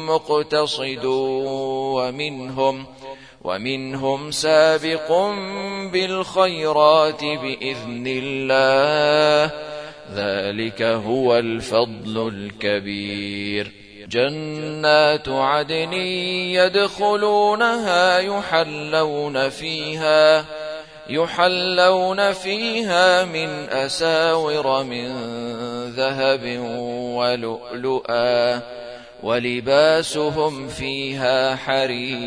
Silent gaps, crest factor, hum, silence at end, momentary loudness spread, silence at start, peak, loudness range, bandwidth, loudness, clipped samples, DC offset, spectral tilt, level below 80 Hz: none; 20 dB; none; 0 s; 12 LU; 0 s; 0 dBFS; 5 LU; 10.5 kHz; -20 LUFS; under 0.1%; 0.1%; -4 dB/octave; -56 dBFS